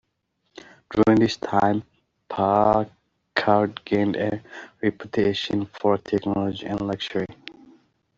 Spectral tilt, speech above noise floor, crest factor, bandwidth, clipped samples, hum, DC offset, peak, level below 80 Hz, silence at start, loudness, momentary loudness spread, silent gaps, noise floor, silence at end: -6.5 dB/octave; 51 dB; 22 dB; 7.6 kHz; under 0.1%; none; under 0.1%; -2 dBFS; -54 dBFS; 0.9 s; -23 LUFS; 13 LU; none; -74 dBFS; 0.65 s